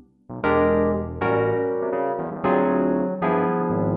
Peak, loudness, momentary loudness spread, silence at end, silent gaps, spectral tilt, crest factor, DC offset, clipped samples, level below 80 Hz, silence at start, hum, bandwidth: -8 dBFS; -22 LUFS; 5 LU; 0 s; none; -11.5 dB/octave; 14 dB; under 0.1%; under 0.1%; -46 dBFS; 0.3 s; none; 4.9 kHz